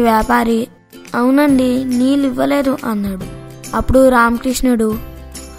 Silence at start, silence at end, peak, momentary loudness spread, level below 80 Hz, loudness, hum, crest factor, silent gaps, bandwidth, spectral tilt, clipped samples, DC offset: 0 s; 0 s; 0 dBFS; 16 LU; -30 dBFS; -14 LUFS; none; 14 dB; none; 16 kHz; -5.5 dB/octave; under 0.1%; under 0.1%